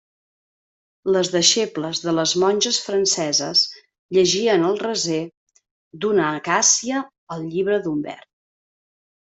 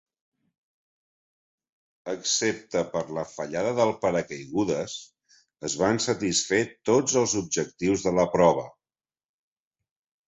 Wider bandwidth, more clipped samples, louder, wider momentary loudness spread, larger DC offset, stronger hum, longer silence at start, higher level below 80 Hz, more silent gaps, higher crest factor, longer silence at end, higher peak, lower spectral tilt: about the same, 8.4 kHz vs 8.4 kHz; neither; first, -19 LUFS vs -25 LUFS; about the same, 12 LU vs 11 LU; neither; neither; second, 1.05 s vs 2.05 s; second, -64 dBFS vs -58 dBFS; first, 3.99-4.09 s, 5.37-5.47 s, 5.71-5.91 s, 7.18-7.27 s vs none; about the same, 20 dB vs 20 dB; second, 1.05 s vs 1.6 s; first, -2 dBFS vs -6 dBFS; about the same, -2.5 dB/octave vs -3.5 dB/octave